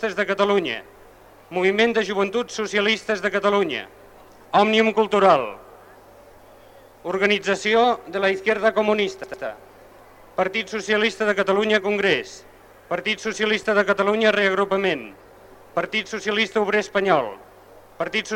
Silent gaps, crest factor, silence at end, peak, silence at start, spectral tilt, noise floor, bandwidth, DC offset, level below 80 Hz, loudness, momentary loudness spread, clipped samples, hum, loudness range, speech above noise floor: none; 18 dB; 0 s; -4 dBFS; 0 s; -4 dB/octave; -48 dBFS; 16 kHz; under 0.1%; -60 dBFS; -21 LUFS; 13 LU; under 0.1%; none; 2 LU; 27 dB